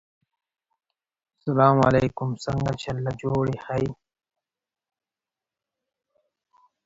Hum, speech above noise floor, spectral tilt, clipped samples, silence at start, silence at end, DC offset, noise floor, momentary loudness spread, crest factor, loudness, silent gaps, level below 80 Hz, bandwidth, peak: none; over 67 dB; -7.5 dB/octave; under 0.1%; 1.45 s; 2.9 s; under 0.1%; under -90 dBFS; 11 LU; 24 dB; -24 LUFS; none; -52 dBFS; 7.8 kHz; -4 dBFS